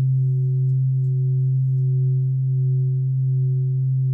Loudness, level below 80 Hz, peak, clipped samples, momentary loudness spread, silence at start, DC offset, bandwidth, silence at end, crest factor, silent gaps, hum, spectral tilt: -21 LUFS; -66 dBFS; -14 dBFS; under 0.1%; 1 LU; 0 s; under 0.1%; 0.4 kHz; 0 s; 4 dB; none; none; -15.5 dB/octave